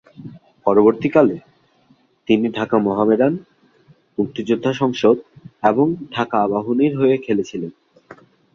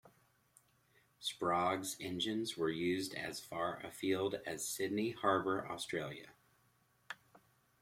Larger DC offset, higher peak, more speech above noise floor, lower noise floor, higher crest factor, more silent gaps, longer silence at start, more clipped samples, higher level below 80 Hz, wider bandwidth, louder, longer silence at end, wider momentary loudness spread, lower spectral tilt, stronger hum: neither; first, 0 dBFS vs -18 dBFS; first, 40 dB vs 36 dB; second, -57 dBFS vs -74 dBFS; about the same, 18 dB vs 22 dB; neither; first, 0.2 s vs 0.05 s; neither; first, -60 dBFS vs -76 dBFS; second, 7.2 kHz vs 16.5 kHz; first, -18 LUFS vs -38 LUFS; about the same, 0.4 s vs 0.45 s; first, 15 LU vs 10 LU; first, -7.5 dB/octave vs -3.5 dB/octave; neither